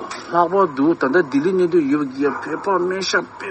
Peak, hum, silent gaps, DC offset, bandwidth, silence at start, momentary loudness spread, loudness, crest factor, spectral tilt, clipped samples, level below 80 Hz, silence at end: -2 dBFS; none; none; under 0.1%; 8.6 kHz; 0 s; 5 LU; -19 LUFS; 16 dB; -5 dB/octave; under 0.1%; -62 dBFS; 0 s